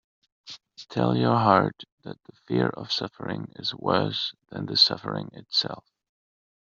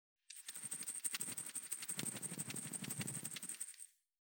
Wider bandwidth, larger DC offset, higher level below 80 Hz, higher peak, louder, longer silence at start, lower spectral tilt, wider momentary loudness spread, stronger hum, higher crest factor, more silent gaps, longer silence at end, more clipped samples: second, 7.6 kHz vs over 20 kHz; neither; first, -66 dBFS vs under -90 dBFS; first, -4 dBFS vs -24 dBFS; first, -25 LUFS vs -44 LUFS; first, 0.45 s vs 0.3 s; first, -3.5 dB/octave vs -1.5 dB/octave; first, 23 LU vs 9 LU; neither; about the same, 24 dB vs 24 dB; first, 1.92-1.98 s vs none; first, 0.95 s vs 0.4 s; neither